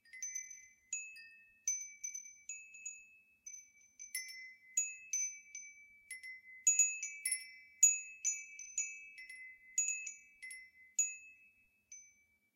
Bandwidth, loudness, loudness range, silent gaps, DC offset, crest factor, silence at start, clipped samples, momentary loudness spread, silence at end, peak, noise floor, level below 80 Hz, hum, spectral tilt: 16 kHz; -36 LUFS; 11 LU; none; under 0.1%; 26 dB; 0.15 s; under 0.1%; 23 LU; 0.45 s; -16 dBFS; -71 dBFS; under -90 dBFS; none; 5.5 dB/octave